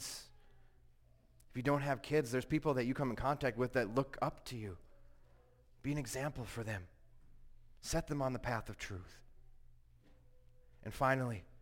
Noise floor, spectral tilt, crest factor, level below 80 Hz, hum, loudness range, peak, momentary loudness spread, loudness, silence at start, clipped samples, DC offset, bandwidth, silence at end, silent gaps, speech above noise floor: -66 dBFS; -5.5 dB/octave; 20 dB; -56 dBFS; none; 7 LU; -20 dBFS; 14 LU; -39 LUFS; 0 s; under 0.1%; under 0.1%; 16.5 kHz; 0 s; none; 28 dB